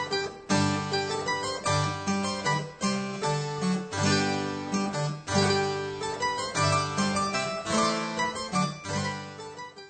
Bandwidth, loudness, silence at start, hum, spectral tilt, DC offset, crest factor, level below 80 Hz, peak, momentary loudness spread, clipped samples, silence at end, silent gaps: 9 kHz; -28 LUFS; 0 s; none; -4 dB/octave; under 0.1%; 18 dB; -60 dBFS; -12 dBFS; 6 LU; under 0.1%; 0 s; none